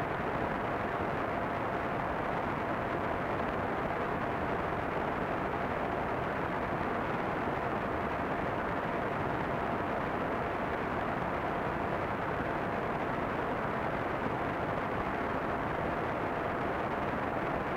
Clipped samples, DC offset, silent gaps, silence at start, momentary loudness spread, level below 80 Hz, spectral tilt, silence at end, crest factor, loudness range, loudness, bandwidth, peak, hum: under 0.1%; under 0.1%; none; 0 s; 0 LU; -50 dBFS; -7.5 dB/octave; 0 s; 12 dB; 0 LU; -34 LUFS; 16 kHz; -22 dBFS; none